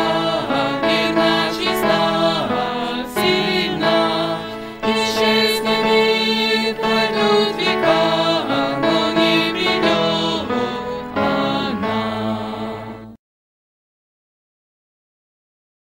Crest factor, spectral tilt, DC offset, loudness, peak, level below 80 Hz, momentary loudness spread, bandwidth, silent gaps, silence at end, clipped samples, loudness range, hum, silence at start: 18 dB; -4.5 dB/octave; under 0.1%; -18 LUFS; -2 dBFS; -50 dBFS; 8 LU; 16 kHz; none; 2.8 s; under 0.1%; 8 LU; none; 0 s